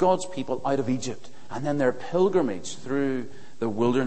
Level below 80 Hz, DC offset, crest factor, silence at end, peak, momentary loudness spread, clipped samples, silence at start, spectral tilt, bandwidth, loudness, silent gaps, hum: -62 dBFS; 2%; 18 dB; 0 s; -8 dBFS; 12 LU; under 0.1%; 0 s; -6 dB/octave; 8.8 kHz; -27 LUFS; none; none